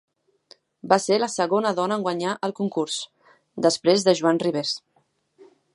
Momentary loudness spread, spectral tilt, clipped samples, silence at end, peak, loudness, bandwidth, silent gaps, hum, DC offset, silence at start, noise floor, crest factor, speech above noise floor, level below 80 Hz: 11 LU; -4 dB/octave; under 0.1%; 0.3 s; -2 dBFS; -23 LUFS; 11.5 kHz; none; none; under 0.1%; 0.85 s; -67 dBFS; 22 dB; 45 dB; -76 dBFS